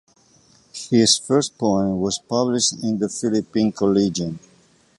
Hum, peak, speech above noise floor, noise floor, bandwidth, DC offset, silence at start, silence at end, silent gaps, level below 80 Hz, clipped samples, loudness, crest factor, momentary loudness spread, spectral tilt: none; -4 dBFS; 36 dB; -56 dBFS; 11.5 kHz; under 0.1%; 0.75 s; 0.6 s; none; -54 dBFS; under 0.1%; -20 LUFS; 18 dB; 12 LU; -4.5 dB/octave